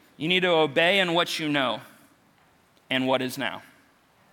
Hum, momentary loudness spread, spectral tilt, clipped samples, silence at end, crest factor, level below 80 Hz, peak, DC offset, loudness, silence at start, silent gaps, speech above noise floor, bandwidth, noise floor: none; 11 LU; -4 dB/octave; under 0.1%; 0.7 s; 20 dB; -72 dBFS; -8 dBFS; under 0.1%; -24 LUFS; 0.2 s; none; 37 dB; 18 kHz; -61 dBFS